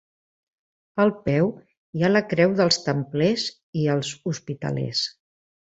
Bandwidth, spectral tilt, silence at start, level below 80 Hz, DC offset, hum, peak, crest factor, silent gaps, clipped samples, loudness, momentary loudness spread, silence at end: 8.2 kHz; -5.5 dB/octave; 0.95 s; -58 dBFS; under 0.1%; none; -4 dBFS; 20 dB; 1.77-1.93 s, 3.63-3.73 s; under 0.1%; -23 LUFS; 10 LU; 0.6 s